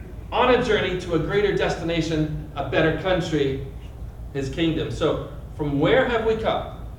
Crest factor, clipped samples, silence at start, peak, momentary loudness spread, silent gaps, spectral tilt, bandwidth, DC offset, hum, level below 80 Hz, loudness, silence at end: 18 dB; under 0.1%; 0 s; -4 dBFS; 12 LU; none; -6 dB/octave; 16.5 kHz; under 0.1%; none; -38 dBFS; -23 LUFS; 0 s